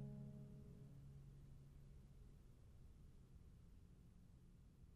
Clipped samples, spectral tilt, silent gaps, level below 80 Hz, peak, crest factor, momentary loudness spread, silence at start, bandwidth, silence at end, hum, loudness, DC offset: under 0.1%; -8 dB/octave; none; -66 dBFS; -44 dBFS; 16 dB; 10 LU; 0 s; 13 kHz; 0 s; none; -64 LUFS; under 0.1%